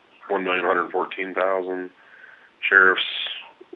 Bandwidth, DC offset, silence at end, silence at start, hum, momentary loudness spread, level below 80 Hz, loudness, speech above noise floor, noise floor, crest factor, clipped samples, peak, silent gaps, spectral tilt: 6.8 kHz; under 0.1%; 0.25 s; 0.25 s; none; 16 LU; -84 dBFS; -21 LUFS; 27 dB; -49 dBFS; 24 dB; under 0.1%; 0 dBFS; none; -5 dB/octave